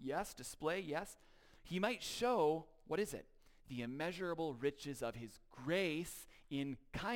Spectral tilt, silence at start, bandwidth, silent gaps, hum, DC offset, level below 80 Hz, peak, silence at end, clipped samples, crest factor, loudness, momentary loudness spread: -4.5 dB/octave; 0 s; 17 kHz; none; none; under 0.1%; -64 dBFS; -24 dBFS; 0 s; under 0.1%; 18 dB; -42 LUFS; 13 LU